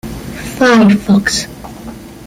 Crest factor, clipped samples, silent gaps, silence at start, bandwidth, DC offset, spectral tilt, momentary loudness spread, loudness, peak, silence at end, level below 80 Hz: 12 dB; under 0.1%; none; 0.05 s; 16 kHz; under 0.1%; -5 dB/octave; 21 LU; -10 LUFS; -2 dBFS; 0 s; -36 dBFS